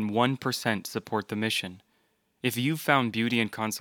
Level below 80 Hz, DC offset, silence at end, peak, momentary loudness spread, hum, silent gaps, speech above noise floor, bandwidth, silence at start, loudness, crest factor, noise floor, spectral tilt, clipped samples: -76 dBFS; under 0.1%; 0 s; -6 dBFS; 8 LU; none; none; 43 dB; over 20 kHz; 0 s; -28 LUFS; 24 dB; -71 dBFS; -4.5 dB/octave; under 0.1%